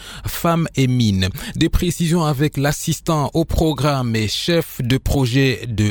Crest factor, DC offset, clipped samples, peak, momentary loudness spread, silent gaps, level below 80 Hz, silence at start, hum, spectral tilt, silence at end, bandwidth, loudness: 14 dB; under 0.1%; under 0.1%; -4 dBFS; 4 LU; none; -30 dBFS; 0 s; none; -5.5 dB/octave; 0 s; over 20 kHz; -19 LUFS